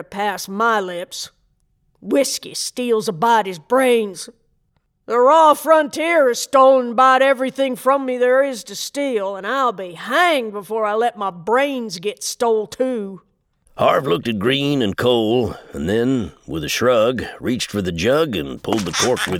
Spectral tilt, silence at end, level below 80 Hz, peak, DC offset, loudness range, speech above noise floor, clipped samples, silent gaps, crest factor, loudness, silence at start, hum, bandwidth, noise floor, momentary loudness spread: -4 dB/octave; 0 s; -52 dBFS; -2 dBFS; under 0.1%; 6 LU; 48 dB; under 0.1%; none; 18 dB; -18 LUFS; 0 s; none; 17 kHz; -65 dBFS; 12 LU